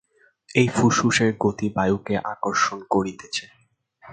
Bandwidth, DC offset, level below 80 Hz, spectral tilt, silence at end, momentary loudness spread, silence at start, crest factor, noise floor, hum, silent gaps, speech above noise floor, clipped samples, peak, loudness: 9.4 kHz; under 0.1%; -54 dBFS; -5 dB/octave; 0 s; 9 LU; 0.5 s; 20 dB; -53 dBFS; none; none; 31 dB; under 0.1%; -2 dBFS; -22 LUFS